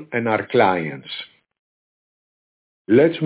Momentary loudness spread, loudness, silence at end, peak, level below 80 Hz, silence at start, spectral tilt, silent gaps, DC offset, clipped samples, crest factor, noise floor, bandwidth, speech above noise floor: 15 LU; -19 LUFS; 0 s; -4 dBFS; -62 dBFS; 0 s; -10 dB/octave; 1.59-2.85 s; under 0.1%; under 0.1%; 18 dB; under -90 dBFS; 4 kHz; over 71 dB